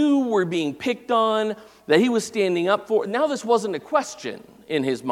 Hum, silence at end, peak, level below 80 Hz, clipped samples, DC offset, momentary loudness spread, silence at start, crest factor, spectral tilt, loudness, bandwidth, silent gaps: none; 0 s; -2 dBFS; -68 dBFS; under 0.1%; under 0.1%; 10 LU; 0 s; 20 dB; -5 dB/octave; -22 LUFS; 15 kHz; none